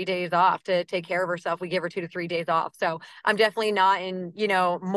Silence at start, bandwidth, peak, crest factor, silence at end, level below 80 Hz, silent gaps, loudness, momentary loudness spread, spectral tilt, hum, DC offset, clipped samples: 0 s; 12.5 kHz; -6 dBFS; 18 dB; 0 s; -78 dBFS; none; -25 LUFS; 7 LU; -5 dB/octave; none; under 0.1%; under 0.1%